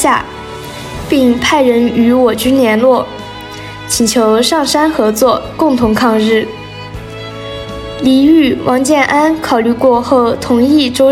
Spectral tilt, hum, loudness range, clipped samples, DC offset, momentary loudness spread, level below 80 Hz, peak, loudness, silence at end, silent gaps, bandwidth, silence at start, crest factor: -4 dB/octave; none; 2 LU; under 0.1%; under 0.1%; 16 LU; -36 dBFS; 0 dBFS; -10 LUFS; 0 s; none; 16.5 kHz; 0 s; 10 dB